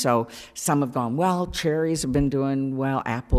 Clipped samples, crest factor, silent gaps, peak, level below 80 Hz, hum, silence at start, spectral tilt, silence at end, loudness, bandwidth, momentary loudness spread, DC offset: under 0.1%; 16 dB; none; -6 dBFS; -44 dBFS; none; 0 s; -5.5 dB/octave; 0 s; -24 LUFS; 15.5 kHz; 3 LU; under 0.1%